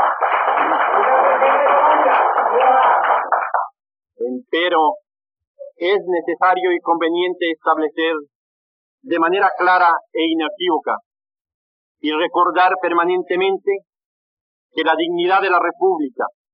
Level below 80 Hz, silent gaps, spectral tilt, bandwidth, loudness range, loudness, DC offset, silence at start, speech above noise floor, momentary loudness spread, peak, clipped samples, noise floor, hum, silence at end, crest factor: -80 dBFS; 5.47-5.55 s, 8.35-8.98 s, 11.06-11.11 s, 11.41-11.45 s, 11.54-11.95 s, 14.05-14.70 s; -0.5 dB/octave; 5.4 kHz; 5 LU; -17 LUFS; under 0.1%; 0 s; over 73 dB; 10 LU; -4 dBFS; under 0.1%; under -90 dBFS; none; 0.25 s; 14 dB